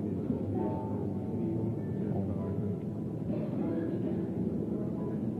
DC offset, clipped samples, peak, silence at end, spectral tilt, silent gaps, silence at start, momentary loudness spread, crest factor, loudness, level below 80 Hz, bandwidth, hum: under 0.1%; under 0.1%; -20 dBFS; 0 s; -11 dB/octave; none; 0 s; 2 LU; 12 dB; -34 LUFS; -58 dBFS; 4.8 kHz; none